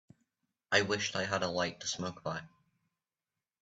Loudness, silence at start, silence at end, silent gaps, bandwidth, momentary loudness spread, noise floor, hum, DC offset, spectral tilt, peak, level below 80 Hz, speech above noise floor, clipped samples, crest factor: -34 LUFS; 0.7 s; 1.15 s; none; 8.4 kHz; 11 LU; under -90 dBFS; none; under 0.1%; -3 dB/octave; -12 dBFS; -74 dBFS; over 56 dB; under 0.1%; 26 dB